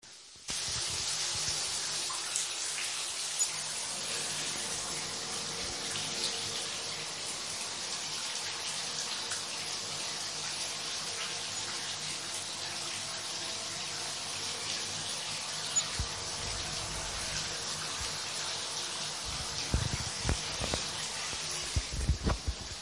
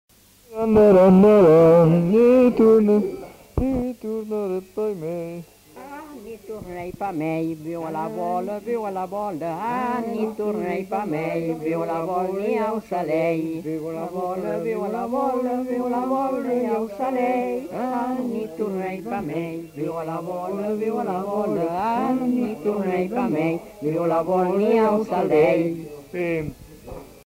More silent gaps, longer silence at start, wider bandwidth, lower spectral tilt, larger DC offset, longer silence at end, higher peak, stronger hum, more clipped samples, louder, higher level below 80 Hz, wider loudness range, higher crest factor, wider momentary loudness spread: neither; second, 0.05 s vs 0.5 s; second, 11.5 kHz vs 16 kHz; second, -1 dB/octave vs -8.5 dB/octave; neither; second, 0 s vs 0.2 s; second, -10 dBFS vs -6 dBFS; neither; neither; second, -33 LUFS vs -22 LUFS; about the same, -48 dBFS vs -48 dBFS; second, 3 LU vs 12 LU; first, 26 dB vs 16 dB; second, 4 LU vs 15 LU